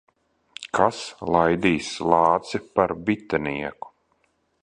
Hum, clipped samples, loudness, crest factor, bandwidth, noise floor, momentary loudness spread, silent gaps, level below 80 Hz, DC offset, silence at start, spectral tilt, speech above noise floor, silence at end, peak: none; under 0.1%; -23 LUFS; 22 dB; 10.5 kHz; -68 dBFS; 17 LU; none; -52 dBFS; under 0.1%; 0.6 s; -5.5 dB/octave; 46 dB; 0.75 s; -2 dBFS